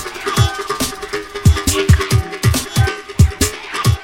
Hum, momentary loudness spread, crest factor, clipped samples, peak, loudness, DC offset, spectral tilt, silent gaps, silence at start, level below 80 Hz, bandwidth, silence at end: none; 7 LU; 16 dB; under 0.1%; 0 dBFS; -16 LUFS; under 0.1%; -4.5 dB/octave; none; 0 s; -24 dBFS; 17 kHz; 0 s